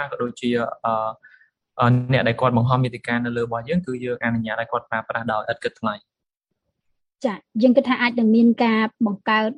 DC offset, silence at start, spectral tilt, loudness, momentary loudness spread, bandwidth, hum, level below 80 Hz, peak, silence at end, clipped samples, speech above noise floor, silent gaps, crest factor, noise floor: under 0.1%; 0 s; -7.5 dB/octave; -21 LUFS; 11 LU; 9.2 kHz; none; -56 dBFS; -4 dBFS; 0.05 s; under 0.1%; 60 dB; none; 18 dB; -81 dBFS